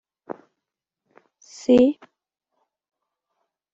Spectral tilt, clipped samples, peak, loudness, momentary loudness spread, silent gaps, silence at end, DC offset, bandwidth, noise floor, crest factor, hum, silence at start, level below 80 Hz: -6 dB/octave; under 0.1%; -6 dBFS; -19 LUFS; 23 LU; none; 1.8 s; under 0.1%; 7.8 kHz; -85 dBFS; 20 dB; none; 1.7 s; -64 dBFS